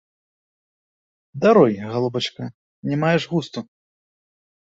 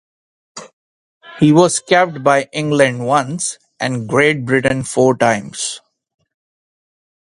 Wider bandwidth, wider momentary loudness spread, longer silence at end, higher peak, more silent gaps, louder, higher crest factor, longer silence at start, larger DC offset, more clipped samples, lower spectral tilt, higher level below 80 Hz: second, 8 kHz vs 11.5 kHz; first, 20 LU vs 11 LU; second, 1.1 s vs 1.6 s; about the same, -2 dBFS vs 0 dBFS; second, 2.54-2.83 s vs 0.73-1.21 s; second, -20 LUFS vs -15 LUFS; about the same, 20 dB vs 16 dB; first, 1.35 s vs 0.55 s; neither; neither; first, -6.5 dB/octave vs -4.5 dB/octave; second, -62 dBFS vs -52 dBFS